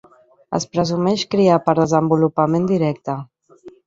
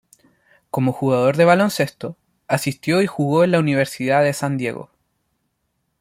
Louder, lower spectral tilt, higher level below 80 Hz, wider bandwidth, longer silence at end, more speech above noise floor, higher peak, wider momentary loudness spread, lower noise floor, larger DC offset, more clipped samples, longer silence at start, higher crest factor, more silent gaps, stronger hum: about the same, -18 LUFS vs -19 LUFS; about the same, -6.5 dB/octave vs -6 dB/octave; first, -56 dBFS vs -62 dBFS; second, 7.8 kHz vs 16 kHz; second, 0.15 s vs 1.15 s; second, 27 dB vs 54 dB; about the same, -2 dBFS vs -2 dBFS; about the same, 11 LU vs 12 LU; second, -45 dBFS vs -72 dBFS; neither; neither; second, 0.5 s vs 0.75 s; about the same, 16 dB vs 18 dB; neither; neither